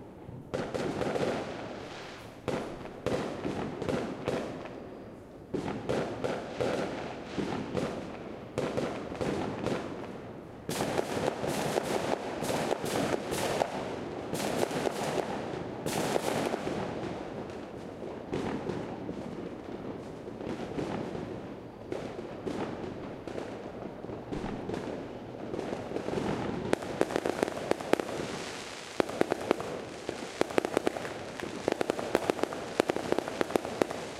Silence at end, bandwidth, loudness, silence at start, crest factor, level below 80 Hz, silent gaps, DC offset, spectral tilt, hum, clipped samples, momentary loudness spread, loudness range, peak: 0 s; 16 kHz; -34 LUFS; 0 s; 32 dB; -58 dBFS; none; under 0.1%; -5 dB/octave; none; under 0.1%; 10 LU; 6 LU; -2 dBFS